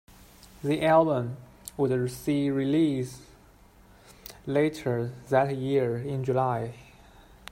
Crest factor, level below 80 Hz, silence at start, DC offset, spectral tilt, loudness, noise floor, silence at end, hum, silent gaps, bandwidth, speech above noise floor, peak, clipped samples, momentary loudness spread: 20 dB; -58 dBFS; 0.6 s; under 0.1%; -7 dB/octave; -27 LUFS; -55 dBFS; 0.7 s; none; none; 16 kHz; 29 dB; -8 dBFS; under 0.1%; 19 LU